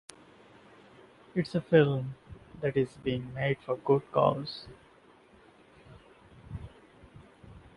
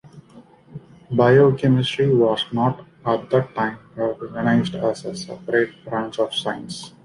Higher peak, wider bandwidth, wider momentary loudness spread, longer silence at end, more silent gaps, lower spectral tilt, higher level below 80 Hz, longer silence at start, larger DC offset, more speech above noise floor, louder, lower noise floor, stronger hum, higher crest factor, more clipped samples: second, -10 dBFS vs -4 dBFS; about the same, 11.5 kHz vs 11 kHz; first, 24 LU vs 13 LU; about the same, 0.2 s vs 0.15 s; neither; about the same, -7.5 dB/octave vs -6.5 dB/octave; about the same, -58 dBFS vs -56 dBFS; first, 1.35 s vs 0.05 s; neither; about the same, 30 dB vs 28 dB; second, -30 LUFS vs -21 LUFS; first, -59 dBFS vs -48 dBFS; neither; first, 24 dB vs 18 dB; neither